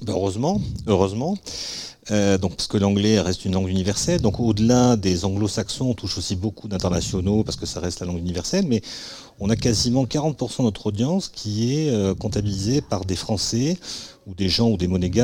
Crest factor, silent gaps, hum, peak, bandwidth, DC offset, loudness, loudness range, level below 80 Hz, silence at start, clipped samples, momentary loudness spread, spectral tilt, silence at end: 20 dB; none; none; -2 dBFS; 16 kHz; under 0.1%; -22 LUFS; 4 LU; -42 dBFS; 0 s; under 0.1%; 8 LU; -5.5 dB/octave; 0 s